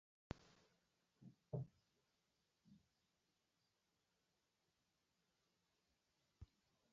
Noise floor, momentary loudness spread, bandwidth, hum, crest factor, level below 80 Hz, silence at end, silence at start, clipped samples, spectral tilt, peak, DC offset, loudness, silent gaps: -88 dBFS; 16 LU; 7.2 kHz; none; 34 dB; -76 dBFS; 0.5 s; 0.3 s; under 0.1%; -7.5 dB/octave; -30 dBFS; under 0.1%; -55 LUFS; none